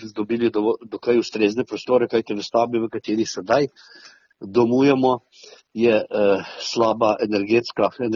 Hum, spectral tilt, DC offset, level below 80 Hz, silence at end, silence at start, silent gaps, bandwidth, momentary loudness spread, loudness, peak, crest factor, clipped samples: none; -4.5 dB/octave; under 0.1%; -62 dBFS; 0 s; 0 s; none; 7.2 kHz; 8 LU; -21 LUFS; -4 dBFS; 16 dB; under 0.1%